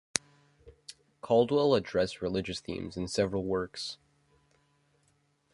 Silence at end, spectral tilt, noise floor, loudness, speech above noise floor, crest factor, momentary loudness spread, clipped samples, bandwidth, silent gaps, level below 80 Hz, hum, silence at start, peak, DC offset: 1.6 s; -4.5 dB/octave; -71 dBFS; -31 LUFS; 42 dB; 28 dB; 24 LU; under 0.1%; 11.5 kHz; none; -58 dBFS; none; 0.15 s; -4 dBFS; under 0.1%